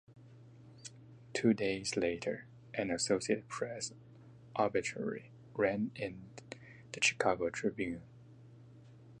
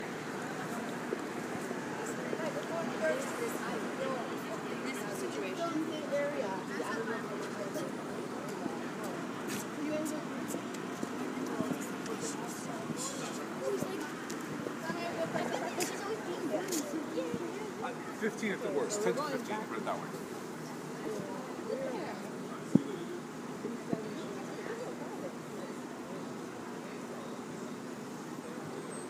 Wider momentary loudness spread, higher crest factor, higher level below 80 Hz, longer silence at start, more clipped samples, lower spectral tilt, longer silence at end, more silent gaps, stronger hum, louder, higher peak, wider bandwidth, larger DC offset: first, 20 LU vs 8 LU; second, 22 dB vs 30 dB; first, -68 dBFS vs -76 dBFS; about the same, 0.1 s vs 0 s; neither; about the same, -4 dB/octave vs -4.5 dB/octave; about the same, 0 s vs 0 s; neither; neither; about the same, -36 LUFS vs -38 LUFS; second, -16 dBFS vs -8 dBFS; second, 11 kHz vs 16 kHz; neither